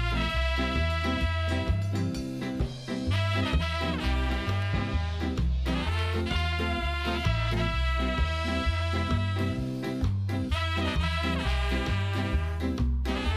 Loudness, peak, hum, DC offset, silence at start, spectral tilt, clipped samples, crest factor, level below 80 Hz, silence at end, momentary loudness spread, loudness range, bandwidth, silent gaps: -29 LUFS; -14 dBFS; none; under 0.1%; 0 s; -6 dB/octave; under 0.1%; 14 dB; -32 dBFS; 0 s; 3 LU; 1 LU; 13 kHz; none